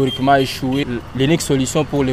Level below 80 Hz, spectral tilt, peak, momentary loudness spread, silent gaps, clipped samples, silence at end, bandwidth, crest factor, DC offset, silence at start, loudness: -38 dBFS; -5 dB/octave; -2 dBFS; 5 LU; none; under 0.1%; 0 s; 15.5 kHz; 14 dB; under 0.1%; 0 s; -17 LUFS